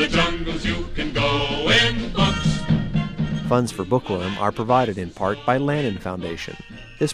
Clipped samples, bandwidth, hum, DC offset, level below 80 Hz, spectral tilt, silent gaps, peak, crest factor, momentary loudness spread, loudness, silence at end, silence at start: under 0.1%; 13 kHz; none; under 0.1%; -34 dBFS; -5 dB/octave; none; -4 dBFS; 18 dB; 11 LU; -22 LUFS; 0 s; 0 s